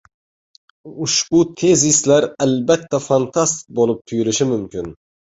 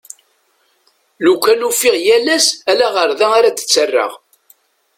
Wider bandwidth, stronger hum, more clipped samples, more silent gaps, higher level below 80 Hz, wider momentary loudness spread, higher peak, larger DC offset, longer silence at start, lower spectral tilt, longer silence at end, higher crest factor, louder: second, 8 kHz vs 16.5 kHz; neither; neither; neither; first, -52 dBFS vs -62 dBFS; first, 10 LU vs 4 LU; about the same, -2 dBFS vs 0 dBFS; neither; second, 0.85 s vs 1.2 s; first, -4 dB/octave vs -0.5 dB/octave; second, 0.4 s vs 0.8 s; about the same, 16 dB vs 14 dB; second, -16 LUFS vs -13 LUFS